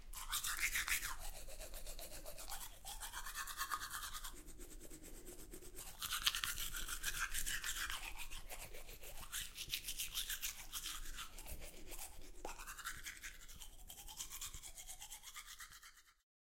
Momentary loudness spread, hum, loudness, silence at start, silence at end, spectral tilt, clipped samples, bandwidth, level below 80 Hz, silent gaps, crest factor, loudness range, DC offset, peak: 17 LU; none; -45 LUFS; 0 s; 0.3 s; 0 dB/octave; under 0.1%; 16.5 kHz; -54 dBFS; none; 32 dB; 8 LU; under 0.1%; -16 dBFS